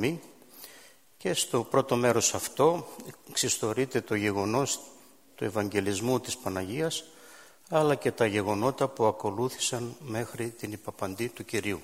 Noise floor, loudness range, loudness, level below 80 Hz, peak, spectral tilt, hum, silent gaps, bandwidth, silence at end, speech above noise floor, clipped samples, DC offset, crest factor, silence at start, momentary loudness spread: -55 dBFS; 4 LU; -29 LUFS; -66 dBFS; -10 dBFS; -4 dB/octave; none; none; 16 kHz; 0 s; 26 dB; under 0.1%; under 0.1%; 20 dB; 0 s; 12 LU